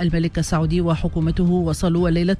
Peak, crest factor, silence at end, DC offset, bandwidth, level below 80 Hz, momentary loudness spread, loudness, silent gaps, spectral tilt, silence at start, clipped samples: -8 dBFS; 10 dB; 0 s; under 0.1%; 11 kHz; -30 dBFS; 3 LU; -20 LUFS; none; -7 dB/octave; 0 s; under 0.1%